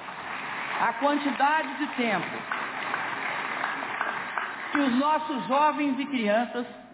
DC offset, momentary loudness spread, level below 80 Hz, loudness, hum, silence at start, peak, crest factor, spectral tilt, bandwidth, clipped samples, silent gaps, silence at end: under 0.1%; 8 LU; -72 dBFS; -27 LUFS; none; 0 s; -12 dBFS; 16 dB; -2 dB/octave; 4 kHz; under 0.1%; none; 0 s